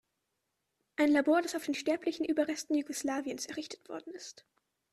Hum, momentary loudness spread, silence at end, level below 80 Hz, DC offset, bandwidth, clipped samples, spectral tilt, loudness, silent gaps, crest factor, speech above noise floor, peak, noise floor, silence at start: none; 17 LU; 0.6 s; -76 dBFS; under 0.1%; 13.5 kHz; under 0.1%; -2.5 dB/octave; -32 LUFS; none; 16 dB; 51 dB; -18 dBFS; -83 dBFS; 1 s